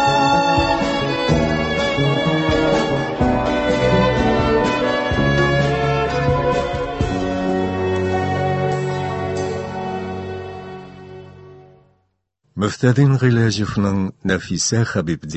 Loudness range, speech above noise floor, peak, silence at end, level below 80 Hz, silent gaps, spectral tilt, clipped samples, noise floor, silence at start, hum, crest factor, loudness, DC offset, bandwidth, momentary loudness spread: 9 LU; 49 dB; -2 dBFS; 0 s; -34 dBFS; none; -5.5 dB/octave; under 0.1%; -67 dBFS; 0 s; none; 16 dB; -18 LUFS; under 0.1%; 8.4 kHz; 10 LU